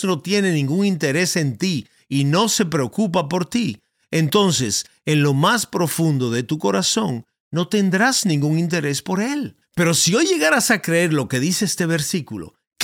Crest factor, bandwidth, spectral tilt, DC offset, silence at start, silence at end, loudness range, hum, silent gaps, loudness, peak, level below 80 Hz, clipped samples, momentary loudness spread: 16 dB; 17.5 kHz; -4 dB/octave; under 0.1%; 0 s; 0 s; 2 LU; none; 7.40-7.51 s; -19 LUFS; -4 dBFS; -60 dBFS; under 0.1%; 9 LU